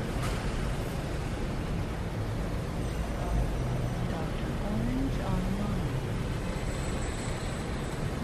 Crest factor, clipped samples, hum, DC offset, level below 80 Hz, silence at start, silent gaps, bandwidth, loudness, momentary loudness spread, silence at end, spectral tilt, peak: 12 dB; under 0.1%; none; under 0.1%; -36 dBFS; 0 s; none; 14 kHz; -33 LUFS; 3 LU; 0 s; -6 dB/octave; -18 dBFS